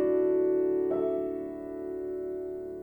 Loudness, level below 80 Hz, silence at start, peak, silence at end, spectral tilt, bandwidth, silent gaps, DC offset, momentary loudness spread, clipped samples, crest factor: -30 LUFS; -62 dBFS; 0 s; -18 dBFS; 0 s; -9.5 dB/octave; 18.5 kHz; none; under 0.1%; 11 LU; under 0.1%; 12 dB